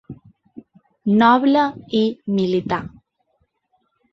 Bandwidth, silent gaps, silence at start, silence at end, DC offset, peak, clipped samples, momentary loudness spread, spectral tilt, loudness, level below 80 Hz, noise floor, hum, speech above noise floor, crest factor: 6.4 kHz; none; 0.1 s; 1.25 s; under 0.1%; -2 dBFS; under 0.1%; 12 LU; -7.5 dB/octave; -18 LUFS; -58 dBFS; -68 dBFS; none; 51 dB; 18 dB